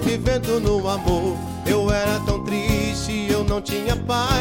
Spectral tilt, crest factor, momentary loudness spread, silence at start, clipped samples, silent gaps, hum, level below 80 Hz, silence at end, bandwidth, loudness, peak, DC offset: -5.5 dB/octave; 14 dB; 3 LU; 0 s; under 0.1%; none; none; -30 dBFS; 0 s; 17 kHz; -22 LUFS; -6 dBFS; under 0.1%